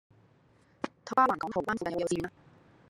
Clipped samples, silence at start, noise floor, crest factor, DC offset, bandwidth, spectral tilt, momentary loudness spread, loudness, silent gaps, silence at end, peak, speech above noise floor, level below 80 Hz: under 0.1%; 0.85 s; -64 dBFS; 22 dB; under 0.1%; 15 kHz; -5 dB/octave; 15 LU; -31 LUFS; none; 0.6 s; -10 dBFS; 34 dB; -66 dBFS